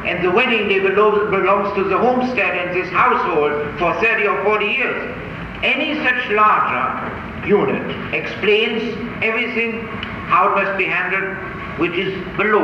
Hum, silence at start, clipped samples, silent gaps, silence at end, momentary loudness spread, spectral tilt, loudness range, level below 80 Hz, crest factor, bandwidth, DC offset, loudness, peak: none; 0 s; under 0.1%; none; 0 s; 10 LU; -6.5 dB/octave; 3 LU; -44 dBFS; 16 dB; 7.2 kHz; under 0.1%; -17 LUFS; -2 dBFS